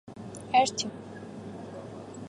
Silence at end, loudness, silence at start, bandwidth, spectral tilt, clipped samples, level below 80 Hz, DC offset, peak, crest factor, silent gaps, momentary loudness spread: 0 s; -27 LUFS; 0.05 s; 11.5 kHz; -3 dB/octave; under 0.1%; -66 dBFS; under 0.1%; -10 dBFS; 22 dB; none; 18 LU